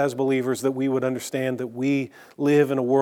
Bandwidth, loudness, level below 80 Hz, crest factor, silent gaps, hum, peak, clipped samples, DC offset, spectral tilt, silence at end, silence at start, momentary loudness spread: 17 kHz; -24 LUFS; -78 dBFS; 16 dB; none; none; -8 dBFS; under 0.1%; under 0.1%; -6 dB/octave; 0 s; 0 s; 7 LU